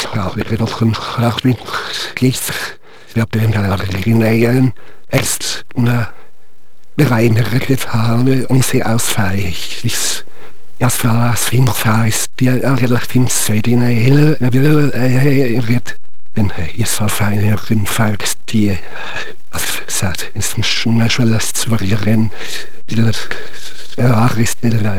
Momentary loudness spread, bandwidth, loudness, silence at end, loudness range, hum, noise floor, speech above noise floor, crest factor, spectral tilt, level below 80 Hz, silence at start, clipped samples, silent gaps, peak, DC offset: 9 LU; 19.5 kHz; -15 LUFS; 0 s; 4 LU; none; -55 dBFS; 41 dB; 16 dB; -5 dB/octave; -42 dBFS; 0 s; under 0.1%; none; 0 dBFS; 20%